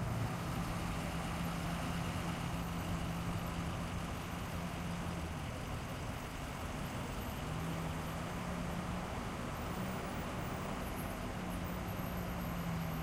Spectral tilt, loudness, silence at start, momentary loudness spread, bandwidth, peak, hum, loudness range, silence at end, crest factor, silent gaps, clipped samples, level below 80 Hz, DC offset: -5.5 dB/octave; -41 LUFS; 0 s; 3 LU; 16 kHz; -26 dBFS; none; 2 LU; 0 s; 14 dB; none; under 0.1%; -48 dBFS; under 0.1%